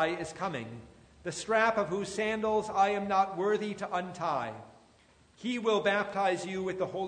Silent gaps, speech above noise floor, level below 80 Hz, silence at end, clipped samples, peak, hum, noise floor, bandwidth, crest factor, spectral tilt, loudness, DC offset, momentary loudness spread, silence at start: none; 32 dB; -64 dBFS; 0 s; under 0.1%; -12 dBFS; none; -62 dBFS; 9.6 kHz; 18 dB; -4.5 dB/octave; -31 LUFS; under 0.1%; 13 LU; 0 s